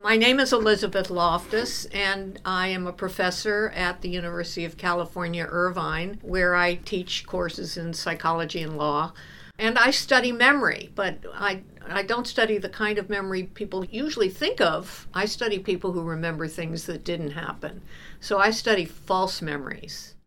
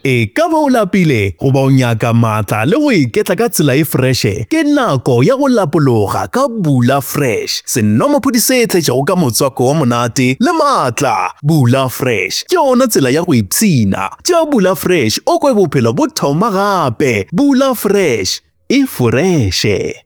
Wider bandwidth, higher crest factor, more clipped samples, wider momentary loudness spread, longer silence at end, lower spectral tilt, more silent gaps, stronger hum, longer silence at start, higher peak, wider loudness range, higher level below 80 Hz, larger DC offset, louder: about the same, 18.5 kHz vs over 20 kHz; first, 22 dB vs 12 dB; neither; first, 12 LU vs 4 LU; about the same, 0.1 s vs 0.1 s; about the same, -4 dB/octave vs -5 dB/octave; neither; neither; about the same, 0 s vs 0.05 s; second, -4 dBFS vs 0 dBFS; first, 5 LU vs 1 LU; about the same, -48 dBFS vs -48 dBFS; neither; second, -25 LUFS vs -12 LUFS